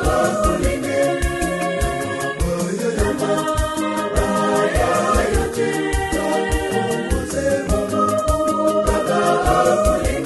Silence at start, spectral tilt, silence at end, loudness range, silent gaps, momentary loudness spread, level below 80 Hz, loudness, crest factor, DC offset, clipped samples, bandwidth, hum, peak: 0 s; -5 dB/octave; 0 s; 2 LU; none; 5 LU; -28 dBFS; -19 LUFS; 16 dB; under 0.1%; under 0.1%; 12.5 kHz; none; -2 dBFS